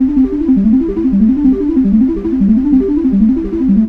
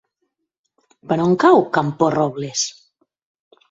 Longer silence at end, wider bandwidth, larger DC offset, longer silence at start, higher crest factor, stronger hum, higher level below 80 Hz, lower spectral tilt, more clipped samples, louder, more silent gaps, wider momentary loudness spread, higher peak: second, 0 s vs 1 s; second, 3.3 kHz vs 7.8 kHz; first, 0.2% vs under 0.1%; second, 0 s vs 1.1 s; second, 10 dB vs 20 dB; neither; first, -28 dBFS vs -60 dBFS; first, -11.5 dB/octave vs -5 dB/octave; neither; first, -12 LUFS vs -18 LUFS; neither; second, 3 LU vs 10 LU; about the same, -2 dBFS vs 0 dBFS